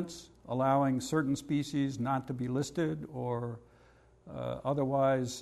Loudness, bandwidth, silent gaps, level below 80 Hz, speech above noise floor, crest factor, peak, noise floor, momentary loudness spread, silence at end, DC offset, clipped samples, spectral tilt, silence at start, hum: -33 LUFS; 13 kHz; none; -62 dBFS; 30 dB; 16 dB; -16 dBFS; -62 dBFS; 13 LU; 0 s; under 0.1%; under 0.1%; -6.5 dB/octave; 0 s; none